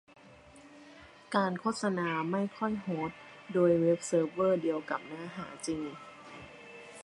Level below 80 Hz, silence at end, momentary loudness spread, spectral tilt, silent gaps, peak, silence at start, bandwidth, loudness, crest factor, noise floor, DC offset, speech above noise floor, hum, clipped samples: -70 dBFS; 0 s; 21 LU; -6 dB/octave; none; -12 dBFS; 0.25 s; 11.5 kHz; -32 LUFS; 20 dB; -55 dBFS; under 0.1%; 24 dB; none; under 0.1%